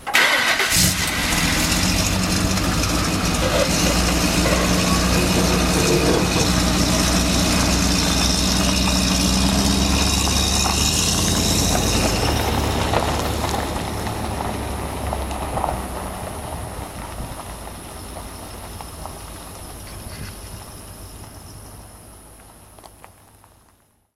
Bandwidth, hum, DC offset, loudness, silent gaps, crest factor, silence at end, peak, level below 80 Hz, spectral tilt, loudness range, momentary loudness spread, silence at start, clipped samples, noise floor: 16 kHz; none; 0.1%; -18 LUFS; none; 18 dB; 1.25 s; -4 dBFS; -28 dBFS; -3.5 dB/octave; 18 LU; 17 LU; 0 s; under 0.1%; -58 dBFS